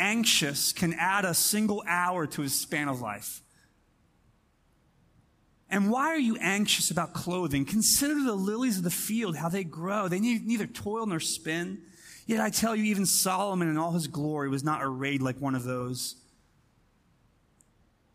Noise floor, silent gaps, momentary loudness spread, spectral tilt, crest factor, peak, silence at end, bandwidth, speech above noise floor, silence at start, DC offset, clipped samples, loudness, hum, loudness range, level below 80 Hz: -67 dBFS; none; 9 LU; -3.5 dB/octave; 20 dB; -10 dBFS; 2 s; 15.5 kHz; 38 dB; 0 s; under 0.1%; under 0.1%; -28 LUFS; none; 8 LU; -62 dBFS